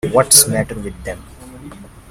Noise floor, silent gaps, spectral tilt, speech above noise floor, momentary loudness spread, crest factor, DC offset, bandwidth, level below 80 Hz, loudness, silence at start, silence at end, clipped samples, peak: -36 dBFS; none; -2.5 dB/octave; 21 dB; 21 LU; 18 dB; under 0.1%; over 20 kHz; -40 dBFS; -11 LUFS; 0.05 s; 0.25 s; 0.1%; 0 dBFS